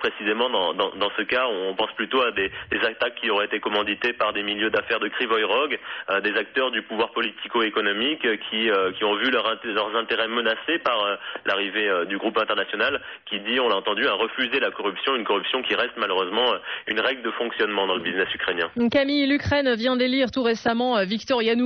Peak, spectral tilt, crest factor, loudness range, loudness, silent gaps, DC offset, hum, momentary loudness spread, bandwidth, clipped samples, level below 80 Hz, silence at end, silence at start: -8 dBFS; -0.5 dB/octave; 14 dB; 1 LU; -23 LUFS; none; under 0.1%; none; 4 LU; 6.4 kHz; under 0.1%; -60 dBFS; 0 s; 0 s